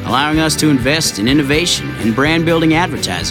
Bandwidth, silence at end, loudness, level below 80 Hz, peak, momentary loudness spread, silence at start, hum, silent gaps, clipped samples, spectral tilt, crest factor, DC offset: 17 kHz; 0 s; -13 LUFS; -34 dBFS; 0 dBFS; 4 LU; 0 s; none; none; under 0.1%; -4 dB/octave; 14 dB; under 0.1%